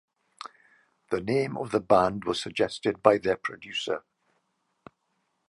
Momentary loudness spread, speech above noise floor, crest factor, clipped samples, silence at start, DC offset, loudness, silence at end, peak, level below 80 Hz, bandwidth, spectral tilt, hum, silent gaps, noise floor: 17 LU; 50 dB; 26 dB; under 0.1%; 0.45 s; under 0.1%; -27 LUFS; 1.5 s; -2 dBFS; -60 dBFS; 11.5 kHz; -5 dB/octave; none; none; -76 dBFS